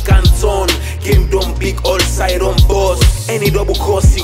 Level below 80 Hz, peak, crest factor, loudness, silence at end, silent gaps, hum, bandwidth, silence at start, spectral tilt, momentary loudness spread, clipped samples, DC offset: -14 dBFS; 0 dBFS; 12 dB; -13 LUFS; 0 s; none; none; 16 kHz; 0 s; -5 dB/octave; 4 LU; under 0.1%; under 0.1%